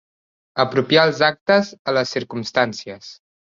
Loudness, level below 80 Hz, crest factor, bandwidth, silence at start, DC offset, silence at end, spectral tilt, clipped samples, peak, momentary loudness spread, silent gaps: -19 LUFS; -62 dBFS; 20 dB; 7.6 kHz; 0.55 s; under 0.1%; 0.45 s; -4.5 dB/octave; under 0.1%; -2 dBFS; 15 LU; 1.41-1.46 s, 1.79-1.85 s